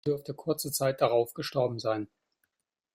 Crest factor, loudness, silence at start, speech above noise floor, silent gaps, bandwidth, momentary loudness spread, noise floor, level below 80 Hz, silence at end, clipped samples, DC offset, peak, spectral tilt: 20 dB; -30 LUFS; 0.05 s; 54 dB; none; 16 kHz; 7 LU; -84 dBFS; -70 dBFS; 0.9 s; under 0.1%; under 0.1%; -12 dBFS; -4.5 dB/octave